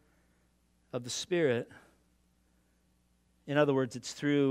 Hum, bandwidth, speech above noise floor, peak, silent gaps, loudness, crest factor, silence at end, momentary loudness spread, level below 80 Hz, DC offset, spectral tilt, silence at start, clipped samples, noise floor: none; 15 kHz; 41 dB; -12 dBFS; none; -32 LUFS; 22 dB; 0 s; 13 LU; -74 dBFS; under 0.1%; -5 dB/octave; 0.95 s; under 0.1%; -71 dBFS